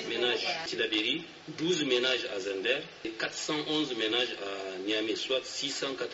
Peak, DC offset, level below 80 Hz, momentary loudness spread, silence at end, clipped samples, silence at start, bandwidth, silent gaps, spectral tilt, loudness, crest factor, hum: -14 dBFS; under 0.1%; -74 dBFS; 8 LU; 0 s; under 0.1%; 0 s; 8 kHz; none; -1 dB/octave; -31 LUFS; 18 dB; none